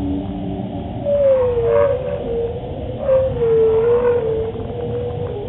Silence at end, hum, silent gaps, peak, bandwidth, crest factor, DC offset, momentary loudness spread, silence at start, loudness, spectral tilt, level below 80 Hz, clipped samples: 0 s; none; none; -4 dBFS; 4 kHz; 14 dB; under 0.1%; 11 LU; 0 s; -18 LUFS; -7.5 dB/octave; -36 dBFS; under 0.1%